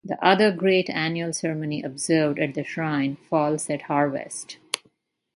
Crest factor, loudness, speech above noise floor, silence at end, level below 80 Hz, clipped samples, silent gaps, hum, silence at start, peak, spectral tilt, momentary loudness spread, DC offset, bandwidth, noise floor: 22 dB; -24 LUFS; 42 dB; 0.6 s; -68 dBFS; under 0.1%; none; none; 0.05 s; -2 dBFS; -4.5 dB/octave; 12 LU; under 0.1%; 11.5 kHz; -65 dBFS